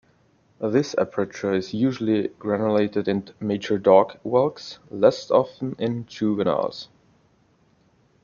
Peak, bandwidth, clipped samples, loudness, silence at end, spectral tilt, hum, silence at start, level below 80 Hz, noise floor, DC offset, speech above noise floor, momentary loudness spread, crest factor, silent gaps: -2 dBFS; 7.2 kHz; under 0.1%; -23 LUFS; 1.4 s; -6.5 dB/octave; none; 0.6 s; -64 dBFS; -61 dBFS; under 0.1%; 39 dB; 10 LU; 20 dB; none